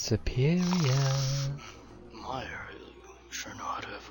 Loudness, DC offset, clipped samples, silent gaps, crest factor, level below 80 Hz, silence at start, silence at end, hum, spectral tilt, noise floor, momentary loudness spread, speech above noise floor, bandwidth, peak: -31 LUFS; under 0.1%; under 0.1%; none; 16 dB; -46 dBFS; 0 s; 0 s; none; -5.5 dB/octave; -50 dBFS; 22 LU; 21 dB; 17.5 kHz; -14 dBFS